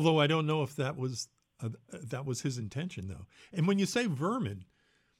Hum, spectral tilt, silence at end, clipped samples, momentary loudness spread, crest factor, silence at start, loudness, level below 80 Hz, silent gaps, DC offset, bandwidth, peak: none; -5.5 dB/octave; 0.55 s; under 0.1%; 16 LU; 18 dB; 0 s; -33 LUFS; -68 dBFS; none; under 0.1%; 14 kHz; -14 dBFS